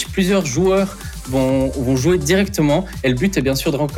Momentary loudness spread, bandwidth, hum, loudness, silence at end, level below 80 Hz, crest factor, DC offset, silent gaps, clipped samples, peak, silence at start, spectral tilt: 4 LU; 19 kHz; none; -17 LUFS; 0 s; -32 dBFS; 12 dB; under 0.1%; none; under 0.1%; -4 dBFS; 0 s; -5.5 dB/octave